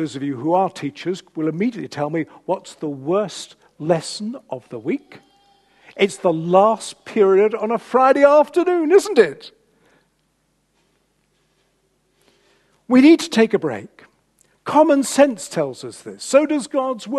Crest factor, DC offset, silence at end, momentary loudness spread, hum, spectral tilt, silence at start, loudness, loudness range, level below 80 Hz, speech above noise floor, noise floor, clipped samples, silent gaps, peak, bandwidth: 20 dB; under 0.1%; 0 s; 16 LU; none; -5 dB/octave; 0 s; -18 LUFS; 9 LU; -68 dBFS; 48 dB; -66 dBFS; under 0.1%; none; 0 dBFS; 12.5 kHz